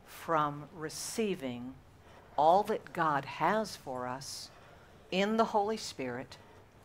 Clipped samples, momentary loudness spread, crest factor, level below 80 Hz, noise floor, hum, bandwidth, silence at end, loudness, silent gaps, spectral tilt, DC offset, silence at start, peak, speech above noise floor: under 0.1%; 15 LU; 20 dB; -66 dBFS; -56 dBFS; none; 16 kHz; 0.25 s; -33 LUFS; none; -4.5 dB/octave; under 0.1%; 0.05 s; -14 dBFS; 24 dB